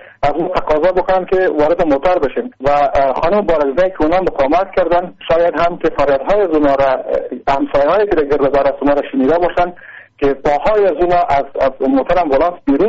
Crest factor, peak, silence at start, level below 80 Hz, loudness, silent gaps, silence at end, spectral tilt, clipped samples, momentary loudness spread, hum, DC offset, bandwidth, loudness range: 8 dB; -6 dBFS; 0 s; -32 dBFS; -14 LUFS; none; 0 s; -4.5 dB/octave; under 0.1%; 5 LU; none; under 0.1%; 7.4 kHz; 1 LU